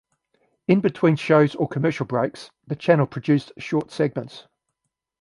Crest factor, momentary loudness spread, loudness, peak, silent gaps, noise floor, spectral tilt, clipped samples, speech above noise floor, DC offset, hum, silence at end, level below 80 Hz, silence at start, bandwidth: 20 dB; 14 LU; -22 LUFS; -4 dBFS; none; -80 dBFS; -8 dB/octave; under 0.1%; 59 dB; under 0.1%; none; 0.8 s; -64 dBFS; 0.7 s; 11 kHz